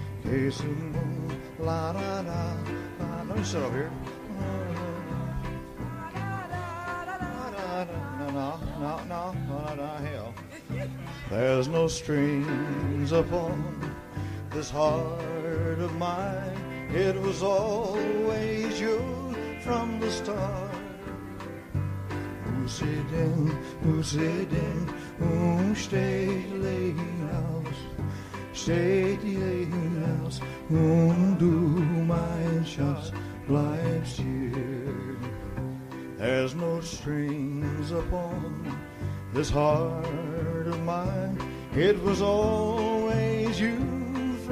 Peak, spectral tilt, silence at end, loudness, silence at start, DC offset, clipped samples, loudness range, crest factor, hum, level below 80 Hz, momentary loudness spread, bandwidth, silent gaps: -10 dBFS; -6.5 dB/octave; 0 s; -29 LUFS; 0 s; under 0.1%; under 0.1%; 8 LU; 18 dB; none; -46 dBFS; 11 LU; 15 kHz; none